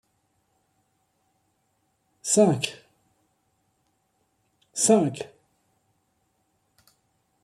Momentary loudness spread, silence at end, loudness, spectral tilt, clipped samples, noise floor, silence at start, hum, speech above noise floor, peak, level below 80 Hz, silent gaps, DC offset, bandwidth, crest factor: 17 LU; 2.15 s; -23 LUFS; -4 dB/octave; under 0.1%; -72 dBFS; 2.25 s; none; 51 dB; -6 dBFS; -72 dBFS; none; under 0.1%; 15 kHz; 24 dB